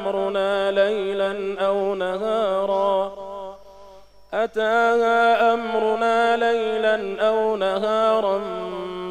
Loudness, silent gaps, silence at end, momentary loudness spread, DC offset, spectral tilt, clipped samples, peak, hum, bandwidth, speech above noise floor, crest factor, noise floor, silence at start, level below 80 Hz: -21 LUFS; none; 0 s; 11 LU; under 0.1%; -5 dB/octave; under 0.1%; -8 dBFS; 50 Hz at -60 dBFS; 11 kHz; 25 dB; 14 dB; -45 dBFS; 0 s; -58 dBFS